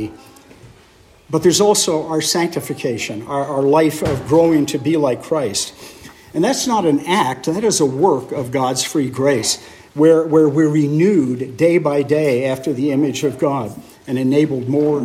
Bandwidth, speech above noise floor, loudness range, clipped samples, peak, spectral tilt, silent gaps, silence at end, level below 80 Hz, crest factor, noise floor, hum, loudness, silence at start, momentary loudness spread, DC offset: 16 kHz; 32 dB; 3 LU; under 0.1%; 0 dBFS; -5 dB/octave; none; 0 s; -52 dBFS; 16 dB; -48 dBFS; none; -17 LUFS; 0 s; 10 LU; under 0.1%